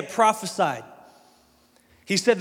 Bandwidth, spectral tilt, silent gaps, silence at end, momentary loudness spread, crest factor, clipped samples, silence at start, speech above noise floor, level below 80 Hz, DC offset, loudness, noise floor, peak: 17 kHz; -3.5 dB/octave; none; 0 s; 5 LU; 20 dB; under 0.1%; 0 s; 37 dB; -72 dBFS; under 0.1%; -24 LUFS; -60 dBFS; -6 dBFS